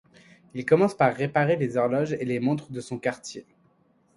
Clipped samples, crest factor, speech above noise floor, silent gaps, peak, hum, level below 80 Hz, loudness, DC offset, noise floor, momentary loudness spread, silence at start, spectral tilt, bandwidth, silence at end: under 0.1%; 20 dB; 39 dB; none; -6 dBFS; none; -66 dBFS; -25 LUFS; under 0.1%; -64 dBFS; 16 LU; 0.55 s; -7 dB/octave; 11.5 kHz; 0.75 s